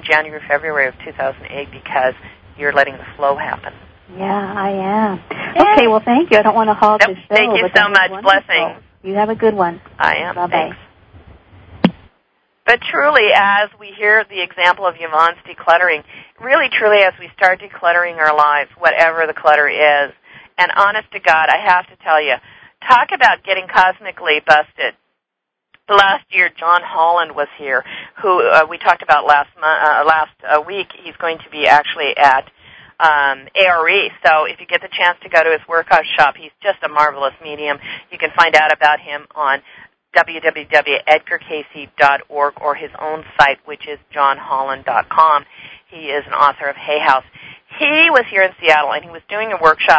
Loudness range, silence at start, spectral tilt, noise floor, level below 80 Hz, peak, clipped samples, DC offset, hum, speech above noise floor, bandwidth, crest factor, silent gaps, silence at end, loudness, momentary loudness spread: 5 LU; 0.05 s; -4.5 dB/octave; -79 dBFS; -52 dBFS; 0 dBFS; 0.3%; under 0.1%; none; 64 dB; 8 kHz; 14 dB; none; 0 s; -14 LUFS; 11 LU